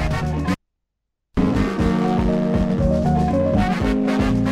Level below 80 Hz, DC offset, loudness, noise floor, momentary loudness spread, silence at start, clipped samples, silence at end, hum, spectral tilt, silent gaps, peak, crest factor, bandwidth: -30 dBFS; under 0.1%; -20 LUFS; -78 dBFS; 5 LU; 0 s; under 0.1%; 0 s; none; -8 dB/octave; none; -6 dBFS; 14 dB; 12 kHz